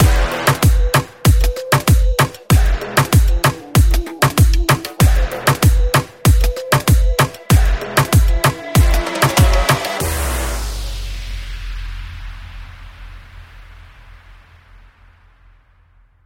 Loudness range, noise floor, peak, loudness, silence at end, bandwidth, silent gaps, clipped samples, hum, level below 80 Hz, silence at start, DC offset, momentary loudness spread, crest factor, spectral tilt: 16 LU; -51 dBFS; -2 dBFS; -15 LUFS; 2.15 s; 17 kHz; none; under 0.1%; none; -18 dBFS; 0 s; under 0.1%; 16 LU; 14 dB; -5 dB/octave